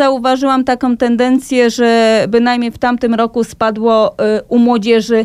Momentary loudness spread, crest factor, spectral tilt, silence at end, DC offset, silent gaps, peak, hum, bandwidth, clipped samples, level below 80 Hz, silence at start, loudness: 4 LU; 10 dB; -5 dB/octave; 0 s; under 0.1%; none; 0 dBFS; none; 13 kHz; under 0.1%; -46 dBFS; 0 s; -12 LUFS